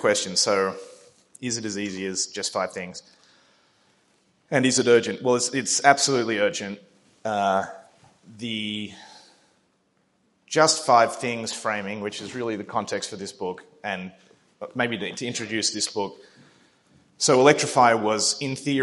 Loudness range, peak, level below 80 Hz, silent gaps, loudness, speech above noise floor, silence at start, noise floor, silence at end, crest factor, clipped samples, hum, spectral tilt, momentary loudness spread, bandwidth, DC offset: 9 LU; 0 dBFS; -74 dBFS; none; -23 LUFS; 44 dB; 0 s; -68 dBFS; 0 s; 24 dB; under 0.1%; none; -3 dB/octave; 17 LU; 11.5 kHz; under 0.1%